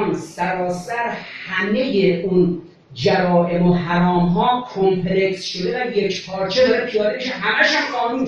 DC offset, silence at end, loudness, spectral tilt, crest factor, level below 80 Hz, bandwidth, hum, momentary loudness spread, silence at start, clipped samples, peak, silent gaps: under 0.1%; 0 s; -19 LUFS; -6 dB/octave; 16 dB; -46 dBFS; 9.6 kHz; none; 7 LU; 0 s; under 0.1%; -2 dBFS; none